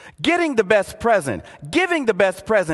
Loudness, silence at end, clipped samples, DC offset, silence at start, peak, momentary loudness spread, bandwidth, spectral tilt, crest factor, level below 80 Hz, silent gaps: -19 LUFS; 0 s; under 0.1%; under 0.1%; 0.05 s; -2 dBFS; 5 LU; 12.5 kHz; -4.5 dB/octave; 18 dB; -48 dBFS; none